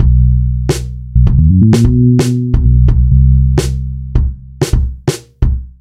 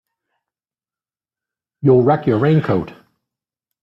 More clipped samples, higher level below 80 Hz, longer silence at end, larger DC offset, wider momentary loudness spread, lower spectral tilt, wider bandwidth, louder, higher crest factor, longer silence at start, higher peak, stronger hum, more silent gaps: neither; first, -14 dBFS vs -54 dBFS; second, 0.1 s vs 0.9 s; neither; about the same, 10 LU vs 8 LU; second, -7.5 dB/octave vs -10.5 dB/octave; first, 12.5 kHz vs 5.6 kHz; first, -12 LUFS vs -16 LUFS; second, 10 dB vs 18 dB; second, 0 s vs 1.85 s; about the same, 0 dBFS vs -2 dBFS; neither; neither